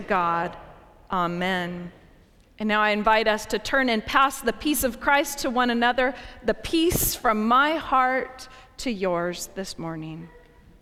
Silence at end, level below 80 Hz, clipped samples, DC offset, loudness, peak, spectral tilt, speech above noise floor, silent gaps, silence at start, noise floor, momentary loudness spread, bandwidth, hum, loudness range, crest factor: 0.45 s; -46 dBFS; under 0.1%; under 0.1%; -23 LUFS; -6 dBFS; -3.5 dB/octave; 31 dB; none; 0 s; -54 dBFS; 13 LU; 17.5 kHz; none; 3 LU; 20 dB